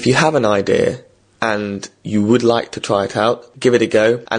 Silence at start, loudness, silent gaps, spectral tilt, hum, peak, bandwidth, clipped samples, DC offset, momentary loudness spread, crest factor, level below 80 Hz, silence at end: 0 s; -16 LUFS; none; -5 dB/octave; none; 0 dBFS; 10 kHz; under 0.1%; under 0.1%; 8 LU; 16 dB; -52 dBFS; 0 s